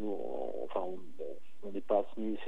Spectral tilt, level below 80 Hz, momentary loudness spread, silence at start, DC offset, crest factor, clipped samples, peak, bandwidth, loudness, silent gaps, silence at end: -7.5 dB/octave; -80 dBFS; 13 LU; 0 s; 2%; 20 dB; under 0.1%; -16 dBFS; 12 kHz; -38 LUFS; none; 0 s